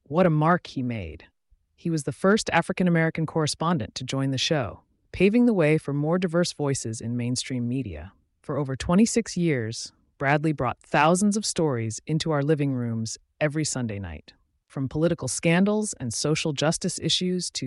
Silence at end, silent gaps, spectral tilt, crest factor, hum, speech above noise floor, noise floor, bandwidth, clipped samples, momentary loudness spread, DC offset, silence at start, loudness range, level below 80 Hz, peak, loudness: 0 s; none; -5 dB/octave; 16 dB; none; 38 dB; -63 dBFS; 11.5 kHz; under 0.1%; 12 LU; under 0.1%; 0.1 s; 3 LU; -52 dBFS; -10 dBFS; -25 LUFS